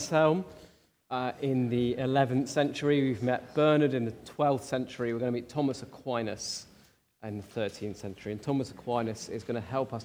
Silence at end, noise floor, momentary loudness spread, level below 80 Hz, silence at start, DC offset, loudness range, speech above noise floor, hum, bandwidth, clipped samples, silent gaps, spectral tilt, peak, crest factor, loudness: 0 s; -62 dBFS; 13 LU; -66 dBFS; 0 s; under 0.1%; 8 LU; 32 dB; none; over 20 kHz; under 0.1%; none; -6 dB/octave; -12 dBFS; 18 dB; -30 LUFS